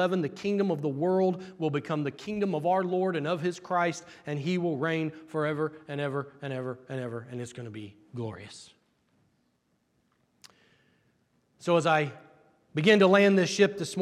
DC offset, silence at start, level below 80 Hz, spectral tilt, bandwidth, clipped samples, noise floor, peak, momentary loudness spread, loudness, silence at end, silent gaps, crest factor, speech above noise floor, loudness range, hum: under 0.1%; 0 s; -76 dBFS; -6 dB/octave; 12.5 kHz; under 0.1%; -73 dBFS; -8 dBFS; 16 LU; -28 LUFS; 0 s; none; 22 dB; 45 dB; 17 LU; none